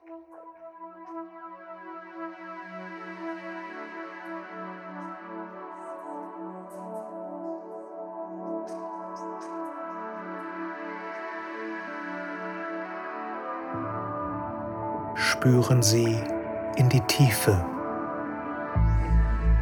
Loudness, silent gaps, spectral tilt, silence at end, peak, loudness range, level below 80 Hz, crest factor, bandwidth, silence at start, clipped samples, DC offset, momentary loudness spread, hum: -29 LUFS; none; -5.5 dB/octave; 0 s; -8 dBFS; 15 LU; -36 dBFS; 22 dB; 19 kHz; 0.05 s; under 0.1%; under 0.1%; 19 LU; none